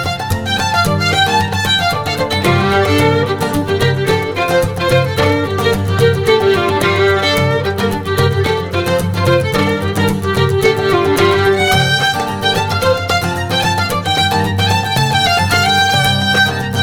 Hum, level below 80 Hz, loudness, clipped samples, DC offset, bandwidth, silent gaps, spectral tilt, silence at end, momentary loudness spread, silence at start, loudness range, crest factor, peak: none; -36 dBFS; -13 LUFS; under 0.1%; under 0.1%; 20 kHz; none; -4.5 dB/octave; 0 s; 4 LU; 0 s; 1 LU; 14 dB; 0 dBFS